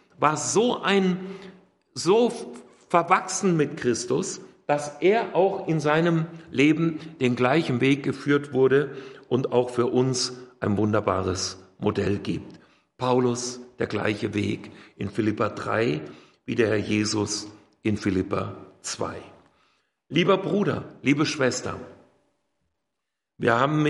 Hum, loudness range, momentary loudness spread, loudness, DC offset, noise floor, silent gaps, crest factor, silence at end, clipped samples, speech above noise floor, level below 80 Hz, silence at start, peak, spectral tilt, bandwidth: none; 4 LU; 12 LU; -24 LUFS; under 0.1%; -84 dBFS; none; 22 dB; 0 s; under 0.1%; 60 dB; -64 dBFS; 0.2 s; -4 dBFS; -5 dB/octave; 11.5 kHz